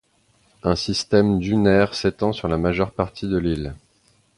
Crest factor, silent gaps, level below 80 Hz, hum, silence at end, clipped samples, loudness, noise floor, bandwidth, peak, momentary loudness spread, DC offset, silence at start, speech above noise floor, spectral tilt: 18 dB; none; -40 dBFS; none; 0.6 s; under 0.1%; -21 LUFS; -61 dBFS; 11 kHz; -2 dBFS; 9 LU; under 0.1%; 0.65 s; 41 dB; -6 dB/octave